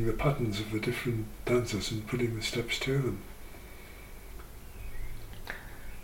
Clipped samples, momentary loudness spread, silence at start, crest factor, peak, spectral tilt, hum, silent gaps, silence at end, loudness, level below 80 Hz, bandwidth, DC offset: under 0.1%; 19 LU; 0 s; 20 dB; -14 dBFS; -5.5 dB/octave; none; none; 0 s; -32 LUFS; -44 dBFS; 17 kHz; 0.1%